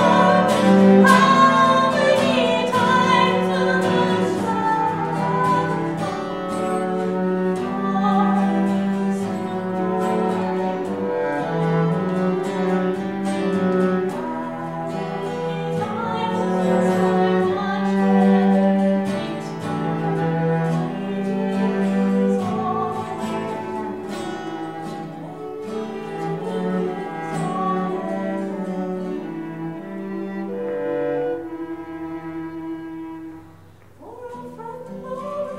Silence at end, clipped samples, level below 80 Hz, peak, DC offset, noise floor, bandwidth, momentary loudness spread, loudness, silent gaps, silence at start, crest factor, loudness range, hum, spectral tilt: 0 s; under 0.1%; -60 dBFS; -2 dBFS; 0.2%; -47 dBFS; 12.5 kHz; 15 LU; -21 LUFS; none; 0 s; 20 dB; 10 LU; none; -6.5 dB/octave